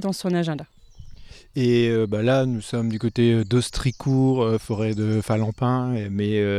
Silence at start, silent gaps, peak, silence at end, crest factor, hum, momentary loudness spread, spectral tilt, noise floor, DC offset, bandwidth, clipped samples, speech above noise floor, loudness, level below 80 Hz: 0 s; none; -8 dBFS; 0 s; 14 dB; none; 6 LU; -7 dB/octave; -41 dBFS; under 0.1%; 13.5 kHz; under 0.1%; 20 dB; -22 LUFS; -44 dBFS